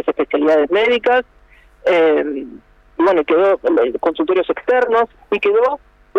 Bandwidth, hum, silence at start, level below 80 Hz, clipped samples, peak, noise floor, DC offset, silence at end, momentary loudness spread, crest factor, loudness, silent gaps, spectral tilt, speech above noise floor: 6.6 kHz; none; 0.05 s; -52 dBFS; under 0.1%; -6 dBFS; -46 dBFS; under 0.1%; 0 s; 8 LU; 10 dB; -16 LUFS; none; -5.5 dB/octave; 31 dB